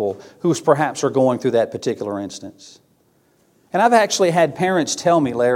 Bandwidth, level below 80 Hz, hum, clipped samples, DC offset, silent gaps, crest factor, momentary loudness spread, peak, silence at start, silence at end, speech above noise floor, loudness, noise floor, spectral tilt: 16 kHz; -64 dBFS; none; under 0.1%; under 0.1%; none; 18 dB; 11 LU; 0 dBFS; 0 s; 0 s; 41 dB; -18 LUFS; -59 dBFS; -4.5 dB/octave